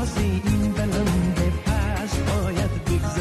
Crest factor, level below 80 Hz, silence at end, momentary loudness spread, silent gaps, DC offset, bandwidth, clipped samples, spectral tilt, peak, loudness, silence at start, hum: 12 dB; -28 dBFS; 0 s; 3 LU; none; under 0.1%; 14 kHz; under 0.1%; -6 dB/octave; -10 dBFS; -23 LUFS; 0 s; none